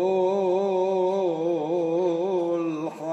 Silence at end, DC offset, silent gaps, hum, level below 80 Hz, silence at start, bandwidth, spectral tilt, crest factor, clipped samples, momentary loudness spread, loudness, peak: 0 s; under 0.1%; none; none; -82 dBFS; 0 s; 8.2 kHz; -7.5 dB/octave; 12 dB; under 0.1%; 4 LU; -25 LUFS; -12 dBFS